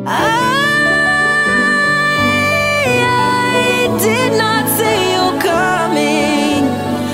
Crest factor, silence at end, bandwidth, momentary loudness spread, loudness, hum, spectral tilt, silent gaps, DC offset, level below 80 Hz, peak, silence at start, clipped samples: 12 dB; 0 s; 16.5 kHz; 3 LU; -12 LUFS; none; -4 dB/octave; none; under 0.1%; -44 dBFS; 0 dBFS; 0 s; under 0.1%